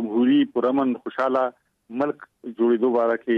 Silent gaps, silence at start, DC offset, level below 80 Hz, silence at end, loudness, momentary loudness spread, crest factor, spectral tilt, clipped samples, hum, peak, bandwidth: none; 0 s; under 0.1%; -72 dBFS; 0 s; -22 LUFS; 11 LU; 14 dB; -7.5 dB/octave; under 0.1%; none; -8 dBFS; 5.2 kHz